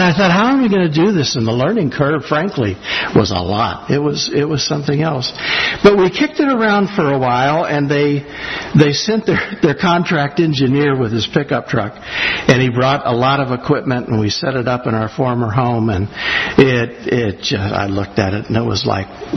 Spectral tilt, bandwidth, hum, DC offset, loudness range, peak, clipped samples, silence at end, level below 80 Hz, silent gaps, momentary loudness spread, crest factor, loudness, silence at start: -5.5 dB/octave; 6.4 kHz; none; under 0.1%; 2 LU; 0 dBFS; under 0.1%; 0 s; -44 dBFS; none; 6 LU; 14 dB; -15 LUFS; 0 s